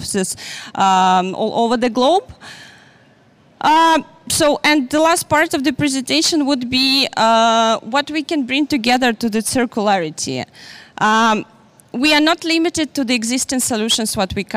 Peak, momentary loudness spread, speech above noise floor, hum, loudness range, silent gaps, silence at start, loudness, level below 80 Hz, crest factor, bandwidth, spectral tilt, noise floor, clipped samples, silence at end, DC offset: -4 dBFS; 9 LU; 34 dB; none; 3 LU; none; 0 s; -16 LUFS; -50 dBFS; 14 dB; 16 kHz; -3 dB/octave; -51 dBFS; under 0.1%; 0 s; under 0.1%